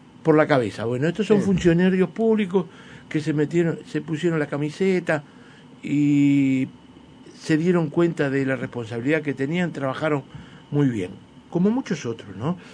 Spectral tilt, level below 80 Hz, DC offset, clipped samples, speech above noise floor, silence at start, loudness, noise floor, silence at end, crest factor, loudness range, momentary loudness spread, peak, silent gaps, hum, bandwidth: -7.5 dB/octave; -54 dBFS; under 0.1%; under 0.1%; 24 dB; 0.25 s; -22 LUFS; -46 dBFS; 0 s; 20 dB; 4 LU; 11 LU; -2 dBFS; none; none; 10 kHz